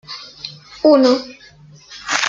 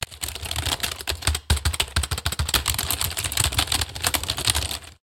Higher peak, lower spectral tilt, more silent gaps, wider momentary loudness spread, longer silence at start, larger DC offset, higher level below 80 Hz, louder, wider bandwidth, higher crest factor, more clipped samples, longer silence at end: about the same, -2 dBFS vs 0 dBFS; about the same, -3 dB/octave vs -2 dB/octave; neither; first, 22 LU vs 5 LU; about the same, 0.1 s vs 0 s; neither; second, -60 dBFS vs -34 dBFS; first, -14 LUFS vs -23 LUFS; second, 9 kHz vs 17 kHz; second, 18 dB vs 24 dB; neither; about the same, 0 s vs 0.1 s